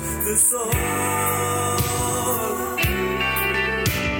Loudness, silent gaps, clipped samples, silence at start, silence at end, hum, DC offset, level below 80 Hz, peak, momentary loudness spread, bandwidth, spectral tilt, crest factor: -21 LUFS; none; under 0.1%; 0 s; 0 s; none; under 0.1%; -36 dBFS; -6 dBFS; 5 LU; 17.5 kHz; -3 dB/octave; 16 dB